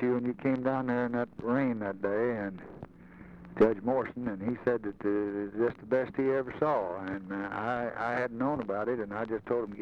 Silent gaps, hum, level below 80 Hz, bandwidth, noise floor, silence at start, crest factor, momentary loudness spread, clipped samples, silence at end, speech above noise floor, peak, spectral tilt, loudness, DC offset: none; none; -62 dBFS; 6.4 kHz; -51 dBFS; 0 s; 18 dB; 8 LU; under 0.1%; 0 s; 20 dB; -14 dBFS; -9 dB/octave; -32 LUFS; under 0.1%